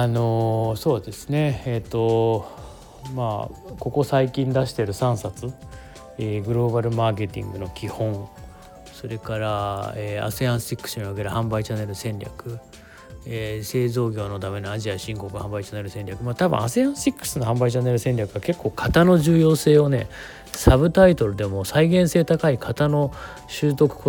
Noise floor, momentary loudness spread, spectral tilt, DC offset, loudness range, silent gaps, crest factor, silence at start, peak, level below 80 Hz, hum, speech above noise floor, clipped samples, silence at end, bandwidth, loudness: -43 dBFS; 17 LU; -6.5 dB/octave; under 0.1%; 10 LU; none; 20 dB; 0 s; -2 dBFS; -40 dBFS; none; 21 dB; under 0.1%; 0 s; 19.5 kHz; -22 LUFS